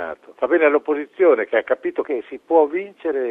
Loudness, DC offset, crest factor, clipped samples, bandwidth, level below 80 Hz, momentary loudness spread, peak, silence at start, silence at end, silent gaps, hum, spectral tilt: -19 LUFS; under 0.1%; 16 dB; under 0.1%; 3.8 kHz; -68 dBFS; 10 LU; -4 dBFS; 0 s; 0 s; none; none; -6.5 dB/octave